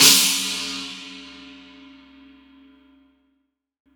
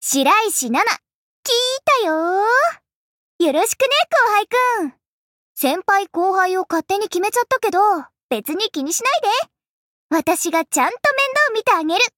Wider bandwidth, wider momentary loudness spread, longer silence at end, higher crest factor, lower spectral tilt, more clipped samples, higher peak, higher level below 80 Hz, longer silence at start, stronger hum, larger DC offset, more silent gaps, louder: first, over 20 kHz vs 17 kHz; first, 28 LU vs 7 LU; first, 2.45 s vs 0.1 s; first, 24 dB vs 14 dB; second, 0.5 dB/octave vs -1 dB/octave; neither; first, 0 dBFS vs -4 dBFS; first, -62 dBFS vs -68 dBFS; about the same, 0 s vs 0 s; neither; neither; second, none vs 1.15-1.43 s, 2.94-3.39 s, 5.07-5.55 s, 8.23-8.29 s, 9.68-10.10 s; about the same, -18 LUFS vs -17 LUFS